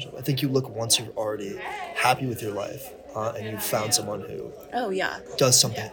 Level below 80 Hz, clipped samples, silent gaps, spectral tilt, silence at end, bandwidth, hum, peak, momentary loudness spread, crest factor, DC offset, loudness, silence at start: -60 dBFS; under 0.1%; none; -3 dB/octave; 0 s; 19 kHz; none; -4 dBFS; 15 LU; 22 dB; under 0.1%; -25 LUFS; 0 s